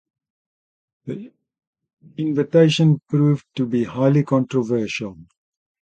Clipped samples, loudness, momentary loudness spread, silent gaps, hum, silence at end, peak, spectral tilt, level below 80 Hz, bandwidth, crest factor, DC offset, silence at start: under 0.1%; -19 LUFS; 18 LU; 1.67-1.73 s, 1.93-1.97 s; none; 0.6 s; -2 dBFS; -7.5 dB/octave; -60 dBFS; 8.6 kHz; 18 dB; under 0.1%; 1.05 s